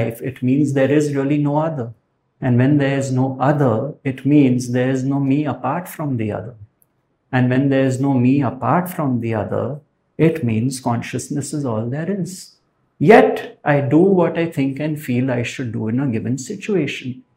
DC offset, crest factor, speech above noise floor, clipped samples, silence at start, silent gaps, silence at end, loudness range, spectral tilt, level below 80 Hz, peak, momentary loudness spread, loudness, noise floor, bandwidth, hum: under 0.1%; 18 dB; 45 dB; under 0.1%; 0 s; none; 0.15 s; 5 LU; -7 dB/octave; -58 dBFS; 0 dBFS; 10 LU; -18 LUFS; -63 dBFS; 16 kHz; none